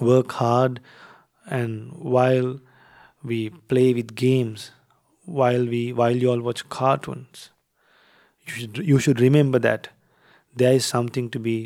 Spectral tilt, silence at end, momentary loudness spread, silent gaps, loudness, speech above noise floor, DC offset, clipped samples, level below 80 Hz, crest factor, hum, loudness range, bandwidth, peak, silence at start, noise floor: -6.5 dB/octave; 0 s; 19 LU; none; -22 LUFS; 41 dB; under 0.1%; under 0.1%; -66 dBFS; 18 dB; none; 3 LU; 15.5 kHz; -4 dBFS; 0 s; -62 dBFS